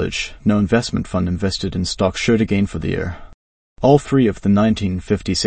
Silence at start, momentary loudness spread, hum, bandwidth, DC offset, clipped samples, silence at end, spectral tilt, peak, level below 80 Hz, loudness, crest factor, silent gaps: 0 s; 8 LU; none; 8.8 kHz; under 0.1%; under 0.1%; 0 s; -6 dB/octave; 0 dBFS; -38 dBFS; -18 LUFS; 18 dB; 3.34-3.76 s